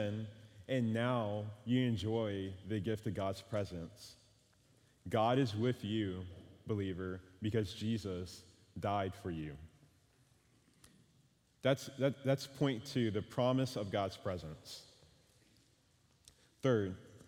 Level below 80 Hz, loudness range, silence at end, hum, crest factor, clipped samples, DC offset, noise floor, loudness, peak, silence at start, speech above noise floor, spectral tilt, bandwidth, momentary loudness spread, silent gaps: -66 dBFS; 6 LU; 0.05 s; none; 20 dB; under 0.1%; under 0.1%; -71 dBFS; -38 LUFS; -18 dBFS; 0 s; 35 dB; -6.5 dB/octave; 16.5 kHz; 16 LU; none